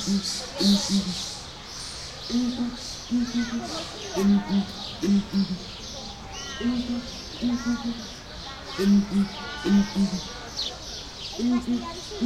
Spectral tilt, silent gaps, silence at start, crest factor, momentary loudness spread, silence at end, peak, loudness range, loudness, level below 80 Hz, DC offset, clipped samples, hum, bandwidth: -4.5 dB/octave; none; 0 s; 18 dB; 14 LU; 0 s; -10 dBFS; 4 LU; -27 LUFS; -46 dBFS; under 0.1%; under 0.1%; none; 14 kHz